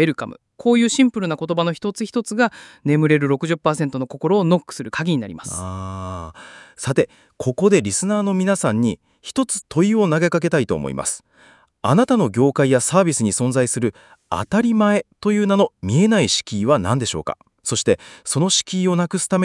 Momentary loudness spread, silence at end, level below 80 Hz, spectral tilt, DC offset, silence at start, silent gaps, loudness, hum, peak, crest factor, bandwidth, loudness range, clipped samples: 11 LU; 0 s; -56 dBFS; -5 dB/octave; under 0.1%; 0 s; none; -19 LUFS; none; -2 dBFS; 18 dB; 12 kHz; 4 LU; under 0.1%